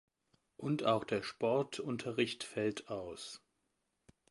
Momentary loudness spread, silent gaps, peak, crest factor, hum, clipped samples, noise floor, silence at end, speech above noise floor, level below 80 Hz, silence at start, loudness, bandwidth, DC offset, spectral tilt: 12 LU; none; -18 dBFS; 20 dB; none; under 0.1%; -83 dBFS; 0.95 s; 46 dB; -74 dBFS; 0.6 s; -37 LUFS; 11.5 kHz; under 0.1%; -5 dB/octave